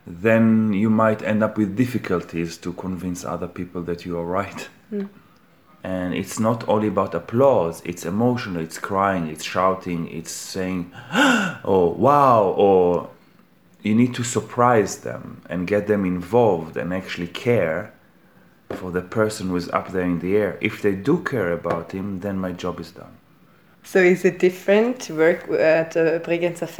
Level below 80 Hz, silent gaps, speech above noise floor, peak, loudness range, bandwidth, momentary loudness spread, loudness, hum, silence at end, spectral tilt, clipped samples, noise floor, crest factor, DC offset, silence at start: -56 dBFS; none; 34 dB; -2 dBFS; 7 LU; over 20 kHz; 13 LU; -21 LUFS; none; 0 s; -6 dB/octave; under 0.1%; -54 dBFS; 20 dB; 0.1%; 0.05 s